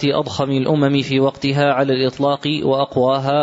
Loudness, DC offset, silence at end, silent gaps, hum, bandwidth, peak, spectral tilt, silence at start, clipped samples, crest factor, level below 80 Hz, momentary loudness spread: -17 LUFS; under 0.1%; 0 s; none; none; 8 kHz; -4 dBFS; -6.5 dB/octave; 0 s; under 0.1%; 12 dB; -54 dBFS; 3 LU